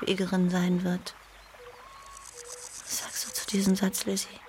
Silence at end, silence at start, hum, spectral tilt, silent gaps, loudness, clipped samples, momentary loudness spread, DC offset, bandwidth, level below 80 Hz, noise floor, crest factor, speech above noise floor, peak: 0 s; 0 s; none; -4.5 dB/octave; none; -29 LUFS; under 0.1%; 22 LU; under 0.1%; 16.5 kHz; -60 dBFS; -50 dBFS; 18 dB; 22 dB; -12 dBFS